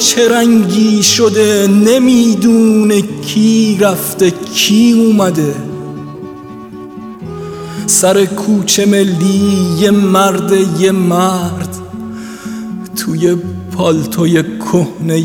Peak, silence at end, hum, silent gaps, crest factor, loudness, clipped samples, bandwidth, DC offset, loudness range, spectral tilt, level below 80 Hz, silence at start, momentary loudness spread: 0 dBFS; 0 s; none; none; 10 dB; -10 LUFS; under 0.1%; 18.5 kHz; under 0.1%; 6 LU; -4.5 dB/octave; -48 dBFS; 0 s; 17 LU